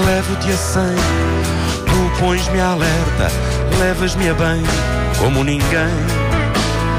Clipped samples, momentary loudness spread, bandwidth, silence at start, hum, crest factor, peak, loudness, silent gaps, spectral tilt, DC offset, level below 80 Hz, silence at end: under 0.1%; 2 LU; 15.5 kHz; 0 s; none; 10 dB; -6 dBFS; -16 LUFS; none; -5 dB/octave; under 0.1%; -22 dBFS; 0 s